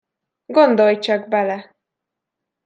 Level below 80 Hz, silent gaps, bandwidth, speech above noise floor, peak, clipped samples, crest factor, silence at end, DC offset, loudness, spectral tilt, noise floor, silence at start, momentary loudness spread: -76 dBFS; none; 7.8 kHz; 66 dB; -2 dBFS; under 0.1%; 18 dB; 1.05 s; under 0.1%; -17 LUFS; -6 dB/octave; -82 dBFS; 0.5 s; 10 LU